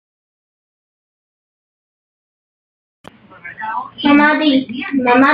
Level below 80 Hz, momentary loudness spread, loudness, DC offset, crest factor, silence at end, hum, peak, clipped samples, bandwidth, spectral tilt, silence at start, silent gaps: -60 dBFS; 18 LU; -14 LUFS; under 0.1%; 16 dB; 0 s; none; -2 dBFS; under 0.1%; 5.2 kHz; -6.5 dB/octave; 3.45 s; none